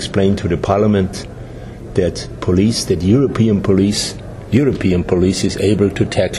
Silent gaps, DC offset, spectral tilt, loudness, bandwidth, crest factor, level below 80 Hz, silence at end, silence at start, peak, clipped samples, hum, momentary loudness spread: none; under 0.1%; -6 dB/octave; -16 LUFS; 13.5 kHz; 14 dB; -36 dBFS; 0 s; 0 s; 0 dBFS; under 0.1%; none; 10 LU